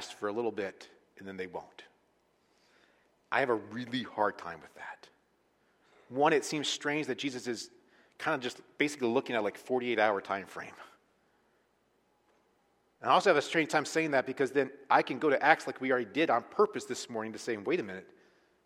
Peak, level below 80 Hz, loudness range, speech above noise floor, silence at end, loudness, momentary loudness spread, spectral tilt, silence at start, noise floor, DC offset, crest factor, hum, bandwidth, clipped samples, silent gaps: -6 dBFS; -80 dBFS; 8 LU; 41 dB; 0.6 s; -31 LUFS; 17 LU; -4 dB/octave; 0 s; -73 dBFS; under 0.1%; 26 dB; none; 15 kHz; under 0.1%; none